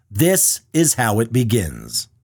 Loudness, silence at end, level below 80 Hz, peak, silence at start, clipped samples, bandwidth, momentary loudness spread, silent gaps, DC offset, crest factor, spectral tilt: -17 LUFS; 0.35 s; -44 dBFS; -4 dBFS; 0.1 s; under 0.1%; 19 kHz; 11 LU; none; under 0.1%; 14 dB; -4 dB/octave